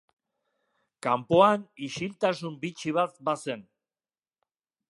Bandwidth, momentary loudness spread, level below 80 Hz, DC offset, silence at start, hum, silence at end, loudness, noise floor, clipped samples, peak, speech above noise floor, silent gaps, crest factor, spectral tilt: 11.5 kHz; 15 LU; -68 dBFS; under 0.1%; 1.05 s; none; 1.3 s; -27 LUFS; under -90 dBFS; under 0.1%; -6 dBFS; over 63 dB; none; 24 dB; -5.5 dB/octave